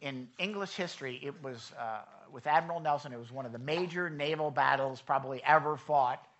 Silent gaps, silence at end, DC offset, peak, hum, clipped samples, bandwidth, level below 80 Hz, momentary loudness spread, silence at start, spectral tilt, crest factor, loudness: none; 0.15 s; under 0.1%; -12 dBFS; none; under 0.1%; 8.2 kHz; -80 dBFS; 15 LU; 0 s; -5 dB/octave; 22 dB; -33 LUFS